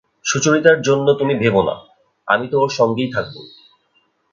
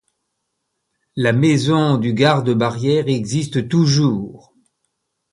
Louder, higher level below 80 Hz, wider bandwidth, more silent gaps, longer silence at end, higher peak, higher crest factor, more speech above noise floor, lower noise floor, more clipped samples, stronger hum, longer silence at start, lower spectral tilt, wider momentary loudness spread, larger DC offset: about the same, -16 LUFS vs -17 LUFS; about the same, -54 dBFS vs -54 dBFS; second, 7.6 kHz vs 11.5 kHz; neither; about the same, 0.85 s vs 0.95 s; about the same, 0 dBFS vs 0 dBFS; about the same, 18 dB vs 18 dB; second, 46 dB vs 58 dB; second, -62 dBFS vs -74 dBFS; neither; neither; second, 0.25 s vs 1.15 s; second, -4.5 dB/octave vs -6 dB/octave; first, 17 LU vs 6 LU; neither